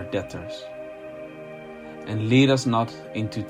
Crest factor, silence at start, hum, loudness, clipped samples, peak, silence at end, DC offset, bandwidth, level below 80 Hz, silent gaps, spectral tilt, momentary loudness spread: 18 dB; 0 s; none; -23 LUFS; under 0.1%; -6 dBFS; 0 s; under 0.1%; 11.5 kHz; -60 dBFS; none; -6 dB/octave; 21 LU